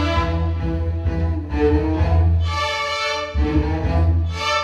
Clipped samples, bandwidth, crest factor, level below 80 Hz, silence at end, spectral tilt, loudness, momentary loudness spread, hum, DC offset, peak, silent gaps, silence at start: under 0.1%; 8 kHz; 12 dB; -24 dBFS; 0 s; -6 dB/octave; -20 LUFS; 5 LU; none; under 0.1%; -6 dBFS; none; 0 s